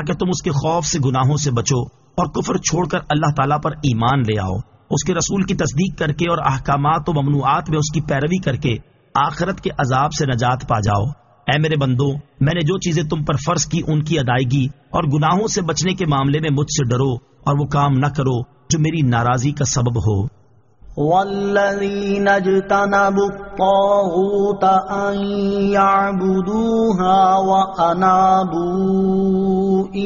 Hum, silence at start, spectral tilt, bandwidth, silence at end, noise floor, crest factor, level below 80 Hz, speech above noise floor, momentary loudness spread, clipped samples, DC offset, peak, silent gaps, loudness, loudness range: none; 0 s; -5.5 dB/octave; 7.4 kHz; 0 s; -46 dBFS; 14 dB; -40 dBFS; 29 dB; 6 LU; under 0.1%; under 0.1%; -2 dBFS; none; -18 LUFS; 3 LU